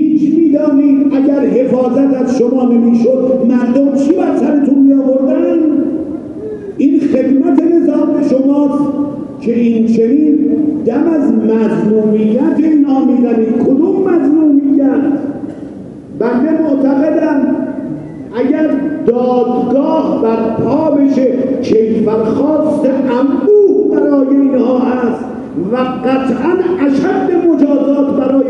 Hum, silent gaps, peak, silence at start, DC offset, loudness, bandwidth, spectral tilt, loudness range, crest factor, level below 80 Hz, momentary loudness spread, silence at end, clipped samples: none; none; 0 dBFS; 0 s; under 0.1%; -11 LUFS; 7 kHz; -8.5 dB/octave; 3 LU; 10 dB; -52 dBFS; 8 LU; 0 s; under 0.1%